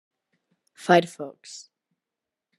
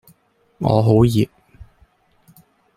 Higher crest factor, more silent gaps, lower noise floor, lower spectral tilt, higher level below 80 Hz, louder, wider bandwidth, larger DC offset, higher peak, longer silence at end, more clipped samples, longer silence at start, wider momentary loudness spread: first, 24 dB vs 18 dB; neither; first, -87 dBFS vs -58 dBFS; second, -5 dB/octave vs -8.5 dB/octave; second, -80 dBFS vs -44 dBFS; second, -21 LUFS vs -17 LUFS; second, 12.5 kHz vs 15 kHz; neither; second, -6 dBFS vs -2 dBFS; second, 1 s vs 1.15 s; neither; first, 0.85 s vs 0.6 s; first, 22 LU vs 10 LU